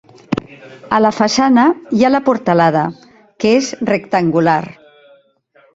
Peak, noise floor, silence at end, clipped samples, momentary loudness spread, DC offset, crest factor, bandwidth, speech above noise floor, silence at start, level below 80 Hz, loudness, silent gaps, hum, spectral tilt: -2 dBFS; -52 dBFS; 1.05 s; under 0.1%; 12 LU; under 0.1%; 14 dB; 7.8 kHz; 39 dB; 0.3 s; -54 dBFS; -14 LUFS; none; none; -5.5 dB/octave